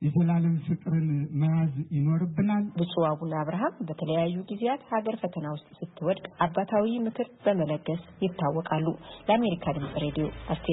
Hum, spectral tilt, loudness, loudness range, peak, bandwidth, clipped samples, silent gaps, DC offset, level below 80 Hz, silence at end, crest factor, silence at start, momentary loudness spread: none; -12 dB/octave; -28 LUFS; 3 LU; -10 dBFS; 4 kHz; under 0.1%; none; under 0.1%; -56 dBFS; 0 s; 18 dB; 0 s; 7 LU